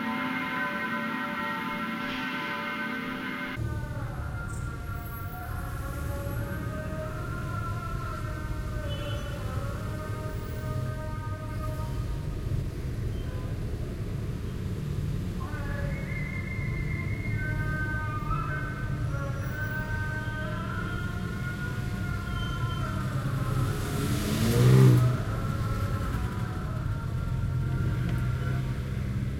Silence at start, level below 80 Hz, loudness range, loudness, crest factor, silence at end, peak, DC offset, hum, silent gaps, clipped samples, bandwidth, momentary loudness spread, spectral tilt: 0 s; -38 dBFS; 9 LU; -31 LUFS; 22 dB; 0 s; -8 dBFS; under 0.1%; none; none; under 0.1%; 16.5 kHz; 6 LU; -6.5 dB/octave